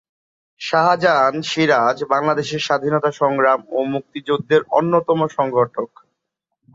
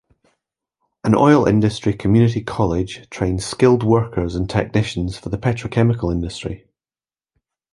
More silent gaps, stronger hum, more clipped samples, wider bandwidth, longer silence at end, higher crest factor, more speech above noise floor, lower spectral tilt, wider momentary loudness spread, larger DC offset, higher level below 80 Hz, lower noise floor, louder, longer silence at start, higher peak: neither; neither; neither; second, 7.8 kHz vs 11.5 kHz; second, 0.9 s vs 1.15 s; about the same, 16 dB vs 18 dB; second, 61 dB vs over 73 dB; second, -5.5 dB/octave vs -7 dB/octave; second, 8 LU vs 12 LU; neither; second, -64 dBFS vs -38 dBFS; second, -78 dBFS vs under -90 dBFS; about the same, -18 LUFS vs -18 LUFS; second, 0.6 s vs 1.05 s; about the same, -2 dBFS vs -2 dBFS